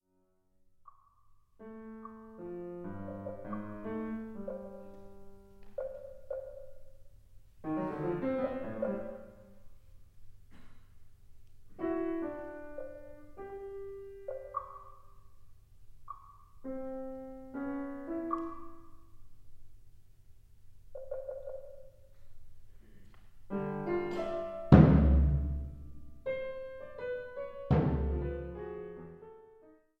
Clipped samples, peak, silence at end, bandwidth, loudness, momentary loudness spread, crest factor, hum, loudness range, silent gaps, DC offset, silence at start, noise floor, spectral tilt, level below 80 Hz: under 0.1%; -4 dBFS; 0.25 s; 5.4 kHz; -34 LUFS; 20 LU; 32 dB; none; 18 LU; none; under 0.1%; 0.8 s; -73 dBFS; -10.5 dB/octave; -42 dBFS